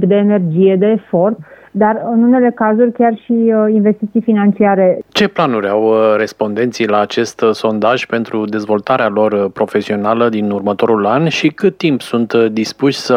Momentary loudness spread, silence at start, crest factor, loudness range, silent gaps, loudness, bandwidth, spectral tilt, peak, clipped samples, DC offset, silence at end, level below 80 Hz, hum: 5 LU; 0 s; 12 dB; 3 LU; none; -13 LUFS; 11 kHz; -6.5 dB/octave; 0 dBFS; under 0.1%; under 0.1%; 0 s; -60 dBFS; none